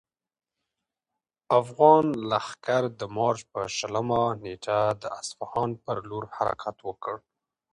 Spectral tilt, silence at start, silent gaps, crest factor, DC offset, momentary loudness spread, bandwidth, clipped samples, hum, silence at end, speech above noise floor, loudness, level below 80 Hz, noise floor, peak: -5.5 dB/octave; 1.5 s; none; 22 dB; under 0.1%; 15 LU; 11 kHz; under 0.1%; none; 0.55 s; 61 dB; -27 LUFS; -62 dBFS; -88 dBFS; -4 dBFS